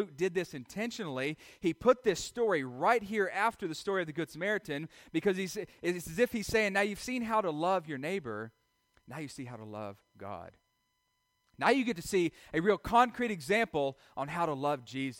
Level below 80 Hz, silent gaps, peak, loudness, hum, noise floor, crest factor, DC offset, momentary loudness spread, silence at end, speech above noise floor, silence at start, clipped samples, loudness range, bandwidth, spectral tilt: -62 dBFS; none; -12 dBFS; -32 LUFS; none; -79 dBFS; 20 dB; under 0.1%; 15 LU; 0 s; 46 dB; 0 s; under 0.1%; 8 LU; 16.5 kHz; -5 dB/octave